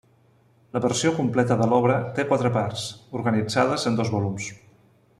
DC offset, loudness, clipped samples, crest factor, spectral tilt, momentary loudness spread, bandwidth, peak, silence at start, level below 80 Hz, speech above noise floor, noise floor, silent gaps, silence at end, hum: under 0.1%; -23 LUFS; under 0.1%; 18 dB; -5.5 dB/octave; 12 LU; 12.5 kHz; -6 dBFS; 0.75 s; -60 dBFS; 36 dB; -59 dBFS; none; 0.65 s; none